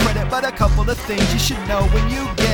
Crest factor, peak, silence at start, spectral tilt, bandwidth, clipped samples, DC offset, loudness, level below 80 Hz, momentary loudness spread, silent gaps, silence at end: 14 dB; -4 dBFS; 0 s; -4.5 dB/octave; 18.5 kHz; under 0.1%; under 0.1%; -19 LUFS; -22 dBFS; 4 LU; none; 0 s